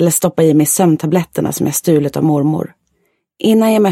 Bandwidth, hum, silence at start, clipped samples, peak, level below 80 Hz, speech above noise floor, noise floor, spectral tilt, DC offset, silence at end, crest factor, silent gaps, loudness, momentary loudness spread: 16.5 kHz; none; 0 s; under 0.1%; 0 dBFS; -52 dBFS; 51 dB; -64 dBFS; -5.5 dB/octave; under 0.1%; 0 s; 12 dB; none; -13 LUFS; 8 LU